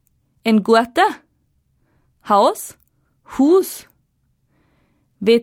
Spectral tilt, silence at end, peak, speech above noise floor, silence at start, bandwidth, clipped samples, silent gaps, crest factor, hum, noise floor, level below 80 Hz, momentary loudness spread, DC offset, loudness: -5 dB/octave; 0 s; -2 dBFS; 49 dB; 0.45 s; 16.5 kHz; under 0.1%; none; 18 dB; none; -65 dBFS; -60 dBFS; 18 LU; under 0.1%; -16 LUFS